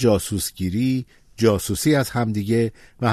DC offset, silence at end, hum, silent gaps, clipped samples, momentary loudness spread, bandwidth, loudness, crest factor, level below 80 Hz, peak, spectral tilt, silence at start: under 0.1%; 0 s; none; none; under 0.1%; 6 LU; 14 kHz; -22 LUFS; 16 dB; -46 dBFS; -4 dBFS; -5.5 dB/octave; 0 s